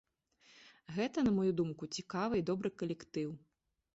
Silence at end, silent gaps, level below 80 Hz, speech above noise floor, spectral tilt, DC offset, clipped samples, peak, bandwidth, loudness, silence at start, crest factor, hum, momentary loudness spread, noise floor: 0.55 s; none; -68 dBFS; 33 dB; -6.5 dB/octave; under 0.1%; under 0.1%; -22 dBFS; 8 kHz; -37 LUFS; 0.65 s; 14 dB; none; 12 LU; -69 dBFS